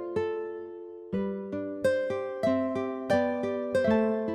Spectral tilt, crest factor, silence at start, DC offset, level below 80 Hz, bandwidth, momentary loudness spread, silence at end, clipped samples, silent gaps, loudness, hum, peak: -7 dB/octave; 16 dB; 0 s; under 0.1%; -66 dBFS; 13 kHz; 10 LU; 0 s; under 0.1%; none; -29 LUFS; none; -14 dBFS